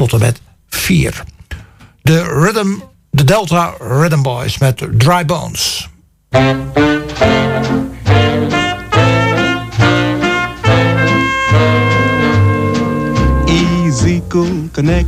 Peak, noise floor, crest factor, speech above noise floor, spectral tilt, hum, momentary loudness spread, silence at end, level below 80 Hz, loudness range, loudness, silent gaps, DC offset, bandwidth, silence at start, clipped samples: 0 dBFS; -37 dBFS; 12 dB; 25 dB; -5.5 dB/octave; none; 6 LU; 0 s; -28 dBFS; 2 LU; -13 LUFS; none; under 0.1%; 16 kHz; 0 s; under 0.1%